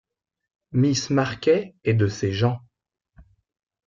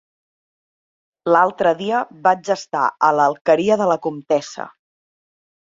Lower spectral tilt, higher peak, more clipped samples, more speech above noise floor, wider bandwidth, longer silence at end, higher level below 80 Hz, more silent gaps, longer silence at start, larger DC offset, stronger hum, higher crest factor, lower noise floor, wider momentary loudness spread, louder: about the same, -6 dB/octave vs -5 dB/octave; second, -8 dBFS vs -2 dBFS; neither; second, 33 dB vs over 72 dB; about the same, 7.6 kHz vs 7.8 kHz; second, 0.65 s vs 1.1 s; first, -56 dBFS vs -66 dBFS; second, none vs 3.41-3.45 s; second, 0.75 s vs 1.25 s; neither; neither; about the same, 16 dB vs 18 dB; second, -55 dBFS vs under -90 dBFS; second, 4 LU vs 9 LU; second, -23 LUFS vs -18 LUFS